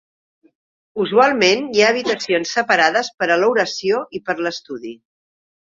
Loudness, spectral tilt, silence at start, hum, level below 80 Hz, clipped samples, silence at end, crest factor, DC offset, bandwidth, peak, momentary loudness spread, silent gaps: -17 LUFS; -3 dB/octave; 0.95 s; none; -64 dBFS; under 0.1%; 0.8 s; 18 dB; under 0.1%; 7.6 kHz; 0 dBFS; 14 LU; 3.14-3.18 s